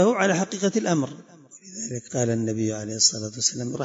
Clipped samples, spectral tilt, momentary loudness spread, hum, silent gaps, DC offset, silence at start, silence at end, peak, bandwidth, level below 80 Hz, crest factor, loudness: under 0.1%; -3.5 dB/octave; 12 LU; none; none; under 0.1%; 0 s; 0 s; -6 dBFS; 8 kHz; -66 dBFS; 18 dB; -24 LUFS